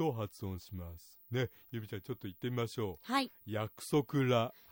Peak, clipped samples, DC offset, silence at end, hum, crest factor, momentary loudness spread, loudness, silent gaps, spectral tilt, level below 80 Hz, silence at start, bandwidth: -18 dBFS; under 0.1%; under 0.1%; 0.2 s; none; 18 dB; 14 LU; -37 LUFS; none; -6 dB/octave; -68 dBFS; 0 s; 16.5 kHz